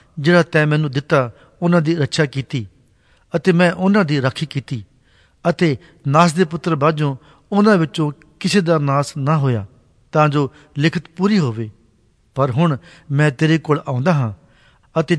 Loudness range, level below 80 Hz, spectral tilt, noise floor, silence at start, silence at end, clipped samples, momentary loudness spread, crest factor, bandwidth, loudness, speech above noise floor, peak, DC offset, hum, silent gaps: 2 LU; -56 dBFS; -6.5 dB/octave; -56 dBFS; 0.15 s; 0 s; under 0.1%; 11 LU; 16 dB; 11 kHz; -18 LUFS; 40 dB; -2 dBFS; under 0.1%; none; none